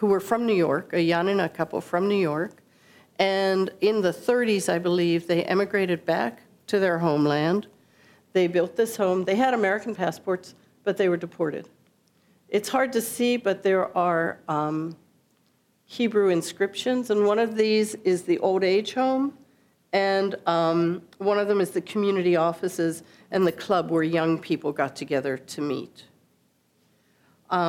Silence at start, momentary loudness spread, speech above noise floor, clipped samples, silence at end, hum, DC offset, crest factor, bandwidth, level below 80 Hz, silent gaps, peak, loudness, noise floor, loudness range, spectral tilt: 0 s; 8 LU; 42 dB; under 0.1%; 0 s; none; under 0.1%; 18 dB; 16.5 kHz; -74 dBFS; none; -6 dBFS; -24 LUFS; -66 dBFS; 3 LU; -5.5 dB/octave